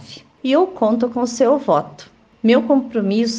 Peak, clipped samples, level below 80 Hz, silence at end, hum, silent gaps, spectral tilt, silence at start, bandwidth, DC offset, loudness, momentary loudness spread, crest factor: -4 dBFS; under 0.1%; -60 dBFS; 0 s; none; none; -5.5 dB/octave; 0 s; 9.4 kHz; under 0.1%; -17 LUFS; 6 LU; 14 dB